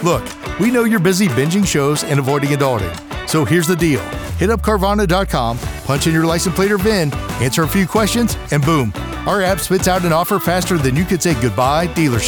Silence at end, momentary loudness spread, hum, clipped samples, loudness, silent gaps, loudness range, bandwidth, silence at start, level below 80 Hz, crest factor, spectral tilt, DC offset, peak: 0 s; 6 LU; none; under 0.1%; -16 LUFS; none; 1 LU; over 20 kHz; 0 s; -32 dBFS; 12 dB; -5 dB/octave; under 0.1%; -2 dBFS